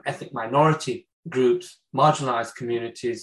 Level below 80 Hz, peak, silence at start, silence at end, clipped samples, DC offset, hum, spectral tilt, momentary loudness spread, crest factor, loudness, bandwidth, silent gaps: -68 dBFS; -6 dBFS; 0.05 s; 0 s; under 0.1%; under 0.1%; none; -6 dB/octave; 12 LU; 18 dB; -24 LUFS; 12 kHz; 1.13-1.23 s